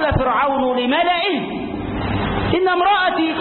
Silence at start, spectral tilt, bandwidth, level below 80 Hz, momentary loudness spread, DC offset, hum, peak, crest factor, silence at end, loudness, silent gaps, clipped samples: 0 s; -11 dB/octave; 4.4 kHz; -34 dBFS; 9 LU; under 0.1%; none; -6 dBFS; 12 dB; 0 s; -18 LUFS; none; under 0.1%